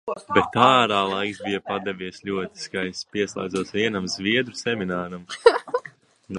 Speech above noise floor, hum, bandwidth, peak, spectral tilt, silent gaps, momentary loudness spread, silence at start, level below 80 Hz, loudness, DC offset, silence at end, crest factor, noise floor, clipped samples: 23 dB; none; 11.5 kHz; 0 dBFS; -4.5 dB/octave; none; 13 LU; 0.05 s; -58 dBFS; -23 LUFS; under 0.1%; 0 s; 24 dB; -46 dBFS; under 0.1%